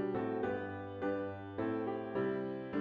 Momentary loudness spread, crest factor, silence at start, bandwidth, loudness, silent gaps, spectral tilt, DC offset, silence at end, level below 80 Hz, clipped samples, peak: 4 LU; 14 dB; 0 s; 4.9 kHz; -39 LUFS; none; -9.5 dB/octave; under 0.1%; 0 s; -70 dBFS; under 0.1%; -24 dBFS